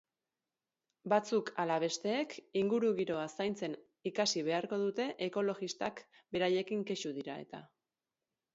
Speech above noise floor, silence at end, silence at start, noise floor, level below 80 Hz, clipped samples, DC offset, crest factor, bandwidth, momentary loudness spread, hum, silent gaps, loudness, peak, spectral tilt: over 55 dB; 0.9 s; 1.05 s; under -90 dBFS; -80 dBFS; under 0.1%; under 0.1%; 20 dB; 7.6 kHz; 11 LU; none; none; -36 LUFS; -16 dBFS; -3.5 dB/octave